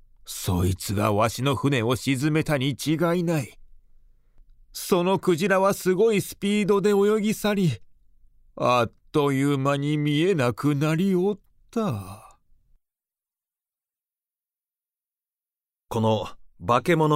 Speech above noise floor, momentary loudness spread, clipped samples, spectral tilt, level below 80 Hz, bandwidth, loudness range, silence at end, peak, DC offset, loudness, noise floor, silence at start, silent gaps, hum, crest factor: over 68 dB; 11 LU; under 0.1%; -6 dB/octave; -52 dBFS; 16 kHz; 10 LU; 0 s; -6 dBFS; under 0.1%; -23 LUFS; under -90 dBFS; 0.25 s; none; none; 18 dB